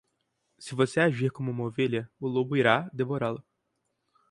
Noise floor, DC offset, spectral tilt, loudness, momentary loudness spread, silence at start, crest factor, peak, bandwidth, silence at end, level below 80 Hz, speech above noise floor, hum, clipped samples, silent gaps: -79 dBFS; under 0.1%; -6.5 dB/octave; -28 LUFS; 9 LU; 0.6 s; 22 dB; -6 dBFS; 11.5 kHz; 0.9 s; -68 dBFS; 51 dB; none; under 0.1%; none